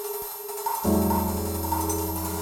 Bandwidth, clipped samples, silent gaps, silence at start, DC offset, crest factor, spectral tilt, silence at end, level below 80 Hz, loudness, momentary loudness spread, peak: over 20 kHz; under 0.1%; none; 0 s; under 0.1%; 16 dB; -5.5 dB/octave; 0 s; -44 dBFS; -27 LUFS; 8 LU; -10 dBFS